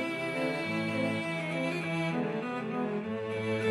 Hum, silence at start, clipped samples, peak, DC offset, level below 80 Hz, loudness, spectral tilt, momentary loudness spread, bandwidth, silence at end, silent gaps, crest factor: none; 0 s; under 0.1%; -18 dBFS; under 0.1%; -76 dBFS; -32 LUFS; -6 dB/octave; 3 LU; 14 kHz; 0 s; none; 14 dB